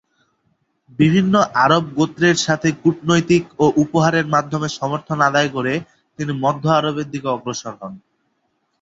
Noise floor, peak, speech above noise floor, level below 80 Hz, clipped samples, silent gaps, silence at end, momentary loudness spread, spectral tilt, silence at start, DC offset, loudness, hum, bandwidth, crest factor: -68 dBFS; -2 dBFS; 51 dB; -54 dBFS; under 0.1%; none; 0.85 s; 11 LU; -5.5 dB/octave; 1 s; under 0.1%; -18 LUFS; none; 8 kHz; 16 dB